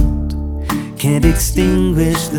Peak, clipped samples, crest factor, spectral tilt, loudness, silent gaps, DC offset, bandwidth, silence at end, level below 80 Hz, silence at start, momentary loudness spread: 0 dBFS; under 0.1%; 14 dB; -5.5 dB/octave; -16 LUFS; none; under 0.1%; 20 kHz; 0 s; -20 dBFS; 0 s; 8 LU